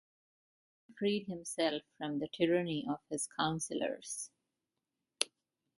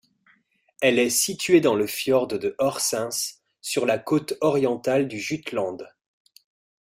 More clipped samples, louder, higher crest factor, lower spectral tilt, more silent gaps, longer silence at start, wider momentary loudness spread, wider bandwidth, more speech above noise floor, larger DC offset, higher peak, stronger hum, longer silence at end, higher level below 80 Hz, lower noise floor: neither; second, -37 LUFS vs -23 LUFS; first, 30 dB vs 18 dB; about the same, -4 dB/octave vs -3.5 dB/octave; neither; about the same, 0.9 s vs 0.8 s; about the same, 9 LU vs 10 LU; second, 12 kHz vs 16 kHz; first, 53 dB vs 40 dB; neither; about the same, -8 dBFS vs -6 dBFS; neither; second, 0.5 s vs 1 s; second, -76 dBFS vs -66 dBFS; first, -89 dBFS vs -63 dBFS